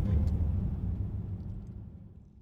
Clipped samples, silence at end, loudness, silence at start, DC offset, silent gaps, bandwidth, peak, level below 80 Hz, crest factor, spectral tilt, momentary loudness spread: under 0.1%; 0 s; -34 LUFS; 0 s; under 0.1%; none; 4.3 kHz; -18 dBFS; -38 dBFS; 14 dB; -10.5 dB/octave; 19 LU